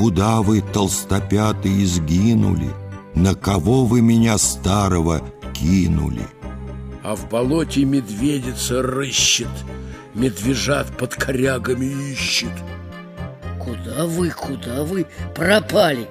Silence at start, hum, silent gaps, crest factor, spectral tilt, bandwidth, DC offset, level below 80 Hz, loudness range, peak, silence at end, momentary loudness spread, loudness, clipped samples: 0 s; none; none; 18 dB; -5 dB/octave; 15.5 kHz; under 0.1%; -34 dBFS; 6 LU; -2 dBFS; 0 s; 16 LU; -19 LUFS; under 0.1%